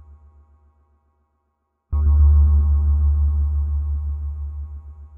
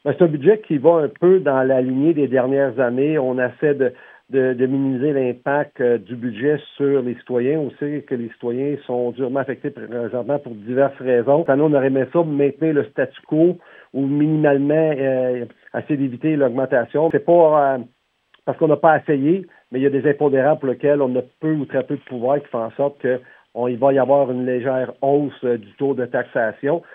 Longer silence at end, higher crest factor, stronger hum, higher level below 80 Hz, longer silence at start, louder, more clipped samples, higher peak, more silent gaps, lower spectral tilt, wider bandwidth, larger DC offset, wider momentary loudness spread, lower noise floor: second, 0 s vs 0.15 s; second, 12 dB vs 18 dB; neither; first, -20 dBFS vs -74 dBFS; first, 1.9 s vs 0.05 s; about the same, -20 LUFS vs -19 LUFS; neither; second, -8 dBFS vs 0 dBFS; neither; about the same, -12 dB/octave vs -11 dB/octave; second, 1.3 kHz vs 3.8 kHz; neither; first, 17 LU vs 9 LU; first, -72 dBFS vs -60 dBFS